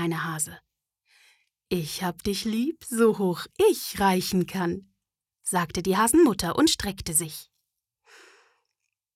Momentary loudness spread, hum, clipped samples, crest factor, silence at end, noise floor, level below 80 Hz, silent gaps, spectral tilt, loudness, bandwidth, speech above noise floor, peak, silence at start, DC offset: 10 LU; none; under 0.1%; 16 dB; 1.7 s; -84 dBFS; -52 dBFS; none; -4 dB/octave; -25 LUFS; 17 kHz; 59 dB; -10 dBFS; 0 s; under 0.1%